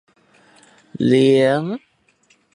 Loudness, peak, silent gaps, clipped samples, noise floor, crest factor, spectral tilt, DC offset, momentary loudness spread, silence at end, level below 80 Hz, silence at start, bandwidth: -16 LUFS; -2 dBFS; none; under 0.1%; -59 dBFS; 16 dB; -7 dB/octave; under 0.1%; 15 LU; 0.8 s; -62 dBFS; 0.95 s; 11 kHz